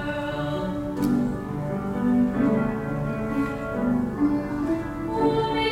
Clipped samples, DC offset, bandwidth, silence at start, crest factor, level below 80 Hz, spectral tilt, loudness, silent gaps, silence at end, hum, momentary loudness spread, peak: under 0.1%; under 0.1%; 16 kHz; 0 s; 14 dB; -44 dBFS; -7.5 dB/octave; -25 LUFS; none; 0 s; none; 6 LU; -10 dBFS